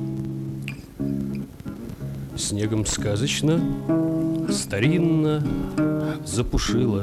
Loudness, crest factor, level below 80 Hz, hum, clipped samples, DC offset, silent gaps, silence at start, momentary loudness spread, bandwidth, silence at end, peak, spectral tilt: -24 LUFS; 14 dB; -38 dBFS; none; under 0.1%; under 0.1%; none; 0 s; 12 LU; 14.5 kHz; 0 s; -10 dBFS; -5.5 dB/octave